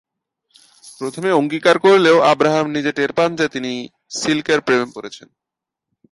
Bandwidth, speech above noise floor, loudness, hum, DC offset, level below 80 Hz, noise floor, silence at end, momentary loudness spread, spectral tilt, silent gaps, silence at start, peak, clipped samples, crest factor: 11.5 kHz; 67 dB; -16 LUFS; none; under 0.1%; -62 dBFS; -84 dBFS; 0.95 s; 17 LU; -4.5 dB/octave; none; 0.85 s; 0 dBFS; under 0.1%; 18 dB